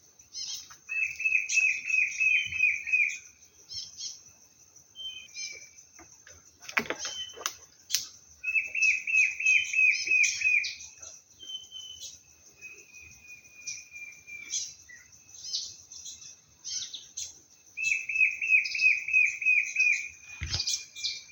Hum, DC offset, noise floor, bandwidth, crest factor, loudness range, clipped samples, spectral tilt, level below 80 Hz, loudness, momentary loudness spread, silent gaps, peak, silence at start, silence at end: none; under 0.1%; -58 dBFS; 17 kHz; 26 dB; 16 LU; under 0.1%; 1 dB/octave; -60 dBFS; -26 LUFS; 21 LU; none; -4 dBFS; 0.35 s; 0 s